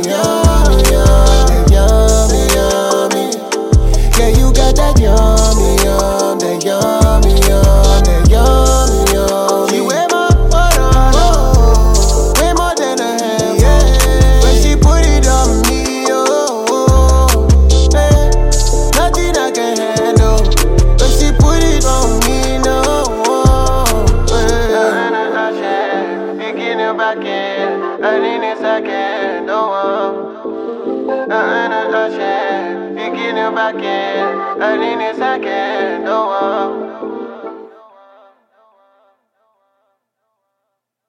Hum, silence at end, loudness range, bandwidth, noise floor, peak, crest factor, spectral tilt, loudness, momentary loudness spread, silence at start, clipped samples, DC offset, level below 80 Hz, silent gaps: none; 3.4 s; 6 LU; 16 kHz; -73 dBFS; 0 dBFS; 10 dB; -5 dB/octave; -12 LUFS; 8 LU; 0 s; under 0.1%; under 0.1%; -14 dBFS; none